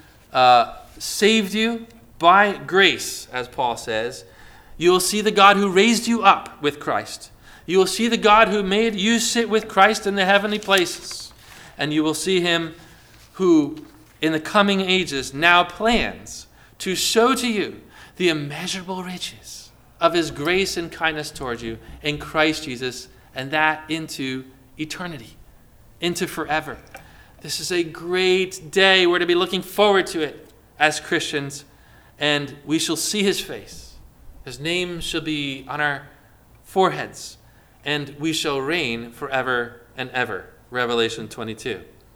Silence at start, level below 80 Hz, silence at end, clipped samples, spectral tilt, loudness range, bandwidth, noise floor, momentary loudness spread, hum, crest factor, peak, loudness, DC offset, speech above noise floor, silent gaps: 0.3 s; -50 dBFS; 0.3 s; under 0.1%; -3.5 dB/octave; 8 LU; 20 kHz; -51 dBFS; 17 LU; none; 22 dB; 0 dBFS; -20 LUFS; under 0.1%; 30 dB; none